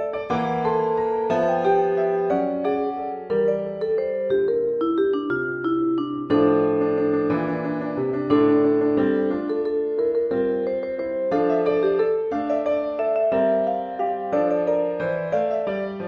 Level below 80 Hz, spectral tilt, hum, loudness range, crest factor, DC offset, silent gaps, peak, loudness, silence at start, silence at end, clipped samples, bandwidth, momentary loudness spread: -58 dBFS; -8.5 dB/octave; none; 2 LU; 14 dB; under 0.1%; none; -6 dBFS; -22 LUFS; 0 s; 0 s; under 0.1%; 6.4 kHz; 6 LU